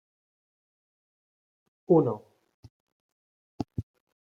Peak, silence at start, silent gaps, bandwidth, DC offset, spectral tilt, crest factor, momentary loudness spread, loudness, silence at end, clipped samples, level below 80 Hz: -10 dBFS; 1.9 s; 2.54-2.63 s, 2.70-3.58 s; 6.6 kHz; under 0.1%; -11 dB/octave; 24 dB; 17 LU; -28 LUFS; 0.4 s; under 0.1%; -62 dBFS